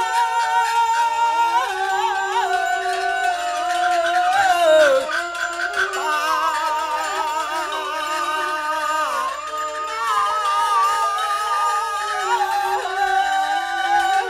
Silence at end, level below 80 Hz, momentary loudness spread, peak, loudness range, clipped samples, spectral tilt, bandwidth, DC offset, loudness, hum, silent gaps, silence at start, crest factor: 0 s; -58 dBFS; 6 LU; -4 dBFS; 4 LU; under 0.1%; 0 dB/octave; 16 kHz; under 0.1%; -20 LUFS; none; none; 0 s; 16 dB